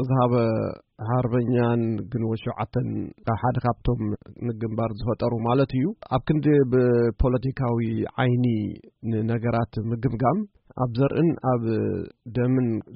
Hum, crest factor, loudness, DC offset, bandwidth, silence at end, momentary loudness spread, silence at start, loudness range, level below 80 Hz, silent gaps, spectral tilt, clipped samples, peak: none; 14 dB; -24 LUFS; under 0.1%; 5.2 kHz; 0 s; 9 LU; 0 s; 3 LU; -42 dBFS; none; -8 dB/octave; under 0.1%; -8 dBFS